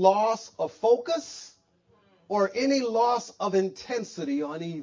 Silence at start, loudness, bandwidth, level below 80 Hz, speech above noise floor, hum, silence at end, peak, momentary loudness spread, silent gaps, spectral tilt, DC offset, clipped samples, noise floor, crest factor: 0 s; -27 LUFS; 7.6 kHz; -74 dBFS; 39 dB; none; 0 s; -8 dBFS; 9 LU; none; -5 dB/octave; under 0.1%; under 0.1%; -65 dBFS; 20 dB